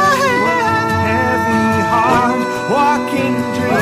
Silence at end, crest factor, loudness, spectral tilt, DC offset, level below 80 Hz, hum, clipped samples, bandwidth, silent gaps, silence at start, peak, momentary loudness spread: 0 s; 10 dB; -14 LUFS; -5.5 dB/octave; under 0.1%; -44 dBFS; none; under 0.1%; 15.5 kHz; none; 0 s; -4 dBFS; 4 LU